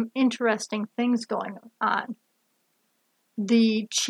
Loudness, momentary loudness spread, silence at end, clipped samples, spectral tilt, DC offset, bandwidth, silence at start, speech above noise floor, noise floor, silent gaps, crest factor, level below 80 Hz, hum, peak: -25 LUFS; 16 LU; 0 s; under 0.1%; -3.5 dB/octave; under 0.1%; 12.5 kHz; 0 s; 46 dB; -71 dBFS; none; 18 dB; -86 dBFS; none; -8 dBFS